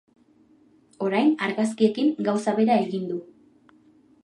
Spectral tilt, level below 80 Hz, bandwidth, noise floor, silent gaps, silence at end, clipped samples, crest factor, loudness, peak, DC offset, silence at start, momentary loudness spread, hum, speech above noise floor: -6 dB/octave; -76 dBFS; 11 kHz; -58 dBFS; none; 1 s; under 0.1%; 18 dB; -24 LUFS; -8 dBFS; under 0.1%; 1 s; 9 LU; none; 36 dB